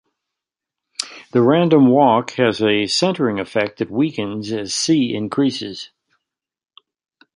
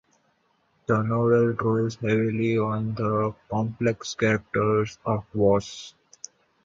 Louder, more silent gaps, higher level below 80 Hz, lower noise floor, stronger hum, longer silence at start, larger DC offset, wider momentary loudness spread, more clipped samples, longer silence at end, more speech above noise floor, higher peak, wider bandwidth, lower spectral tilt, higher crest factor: first, -17 LUFS vs -25 LUFS; neither; second, -60 dBFS vs -54 dBFS; first, -85 dBFS vs -68 dBFS; neither; about the same, 1 s vs 0.9 s; neither; about the same, 15 LU vs 17 LU; neither; first, 1.5 s vs 0.75 s; first, 68 dB vs 44 dB; first, -2 dBFS vs -8 dBFS; first, 11.5 kHz vs 7.6 kHz; second, -5 dB/octave vs -7 dB/octave; about the same, 18 dB vs 18 dB